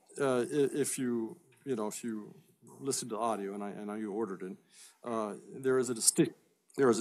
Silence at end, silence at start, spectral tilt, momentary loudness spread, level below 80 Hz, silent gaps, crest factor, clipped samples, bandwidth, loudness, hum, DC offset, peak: 0 s; 0.1 s; -4 dB/octave; 16 LU; -88 dBFS; none; 26 dB; under 0.1%; 15.5 kHz; -34 LUFS; none; under 0.1%; -8 dBFS